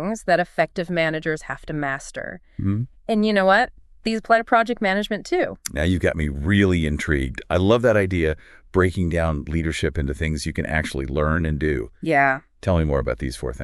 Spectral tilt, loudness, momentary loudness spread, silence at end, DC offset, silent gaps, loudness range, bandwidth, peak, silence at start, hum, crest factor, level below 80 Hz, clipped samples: -6 dB/octave; -22 LUFS; 9 LU; 0 s; under 0.1%; none; 3 LU; 13 kHz; -4 dBFS; 0 s; none; 16 dB; -34 dBFS; under 0.1%